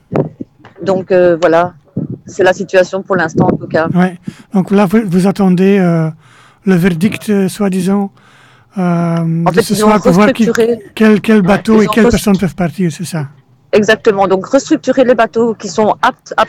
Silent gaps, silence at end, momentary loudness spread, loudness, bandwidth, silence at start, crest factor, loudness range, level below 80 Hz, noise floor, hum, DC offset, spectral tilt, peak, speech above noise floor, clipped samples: none; 0 s; 11 LU; -11 LUFS; 16 kHz; 0.1 s; 12 dB; 4 LU; -40 dBFS; -44 dBFS; none; under 0.1%; -6.5 dB/octave; 0 dBFS; 33 dB; under 0.1%